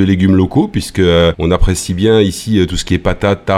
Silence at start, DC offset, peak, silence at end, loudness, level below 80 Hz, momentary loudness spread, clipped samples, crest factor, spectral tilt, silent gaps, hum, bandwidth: 0 s; under 0.1%; 0 dBFS; 0 s; -13 LUFS; -24 dBFS; 5 LU; under 0.1%; 12 dB; -6 dB/octave; none; none; 15 kHz